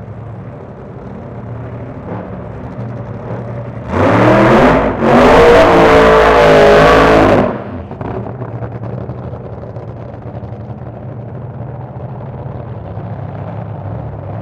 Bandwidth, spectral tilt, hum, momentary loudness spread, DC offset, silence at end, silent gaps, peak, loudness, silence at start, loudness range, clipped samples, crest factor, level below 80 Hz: 15.5 kHz; -6.5 dB/octave; none; 21 LU; under 0.1%; 0 s; none; 0 dBFS; -8 LUFS; 0 s; 19 LU; under 0.1%; 12 dB; -28 dBFS